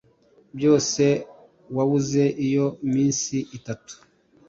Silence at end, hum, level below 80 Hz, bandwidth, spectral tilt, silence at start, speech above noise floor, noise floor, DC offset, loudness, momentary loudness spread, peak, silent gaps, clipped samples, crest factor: 0.55 s; none; -62 dBFS; 7.8 kHz; -5.5 dB/octave; 0.55 s; 36 dB; -58 dBFS; under 0.1%; -22 LUFS; 15 LU; -8 dBFS; none; under 0.1%; 16 dB